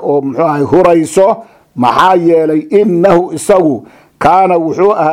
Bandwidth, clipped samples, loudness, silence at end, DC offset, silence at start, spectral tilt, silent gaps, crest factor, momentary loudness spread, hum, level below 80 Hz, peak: 15.5 kHz; 0.5%; -10 LUFS; 0 s; under 0.1%; 0 s; -6 dB/octave; none; 10 dB; 6 LU; none; -44 dBFS; 0 dBFS